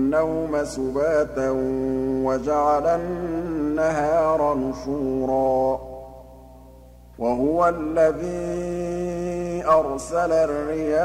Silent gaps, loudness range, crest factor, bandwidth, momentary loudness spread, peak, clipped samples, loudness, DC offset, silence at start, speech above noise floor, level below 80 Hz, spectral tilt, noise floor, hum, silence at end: none; 2 LU; 16 dB; 15 kHz; 7 LU; -6 dBFS; under 0.1%; -23 LUFS; under 0.1%; 0 s; 24 dB; -44 dBFS; -7 dB/octave; -46 dBFS; 60 Hz at -45 dBFS; 0 s